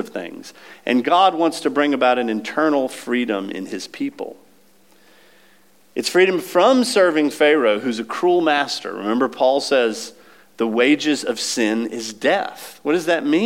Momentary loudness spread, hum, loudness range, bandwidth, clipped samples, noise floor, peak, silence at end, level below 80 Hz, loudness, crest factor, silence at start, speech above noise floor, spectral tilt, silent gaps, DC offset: 14 LU; none; 7 LU; 16.5 kHz; under 0.1%; -55 dBFS; -4 dBFS; 0 s; -78 dBFS; -19 LUFS; 16 dB; 0 s; 37 dB; -3.5 dB/octave; none; 0.2%